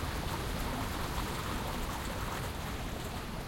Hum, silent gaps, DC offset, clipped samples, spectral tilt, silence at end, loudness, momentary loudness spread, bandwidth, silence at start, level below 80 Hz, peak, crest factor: none; none; under 0.1%; under 0.1%; -4.5 dB/octave; 0 s; -37 LUFS; 3 LU; 16.5 kHz; 0 s; -42 dBFS; -20 dBFS; 16 dB